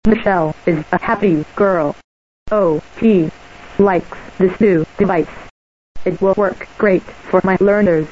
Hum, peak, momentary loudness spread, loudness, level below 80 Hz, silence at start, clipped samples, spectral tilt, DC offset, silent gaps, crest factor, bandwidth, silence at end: none; 0 dBFS; 9 LU; -16 LUFS; -40 dBFS; 0.05 s; under 0.1%; -8.5 dB/octave; 0.6%; 2.04-2.46 s, 5.50-5.95 s; 14 dB; 7.8 kHz; 0 s